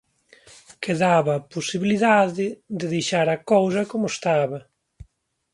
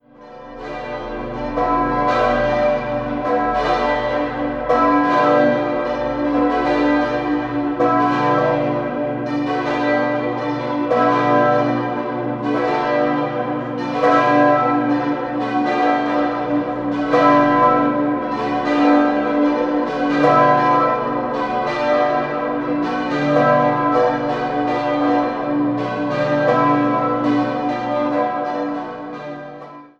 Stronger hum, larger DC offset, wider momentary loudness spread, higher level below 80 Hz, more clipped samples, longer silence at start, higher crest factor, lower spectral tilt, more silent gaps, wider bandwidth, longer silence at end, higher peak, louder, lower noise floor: neither; neither; about the same, 10 LU vs 8 LU; second, -60 dBFS vs -44 dBFS; neither; first, 0.8 s vs 0.2 s; about the same, 18 dB vs 16 dB; second, -5 dB/octave vs -7 dB/octave; neither; first, 11.5 kHz vs 7.2 kHz; first, 0.5 s vs 0.15 s; about the same, -4 dBFS vs -2 dBFS; second, -22 LUFS vs -18 LUFS; first, -65 dBFS vs -39 dBFS